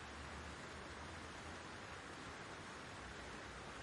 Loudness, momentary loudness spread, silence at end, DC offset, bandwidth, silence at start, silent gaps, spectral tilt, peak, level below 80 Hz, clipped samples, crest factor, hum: -51 LUFS; 1 LU; 0 s; under 0.1%; 11.5 kHz; 0 s; none; -3.5 dB/octave; -38 dBFS; -64 dBFS; under 0.1%; 14 dB; none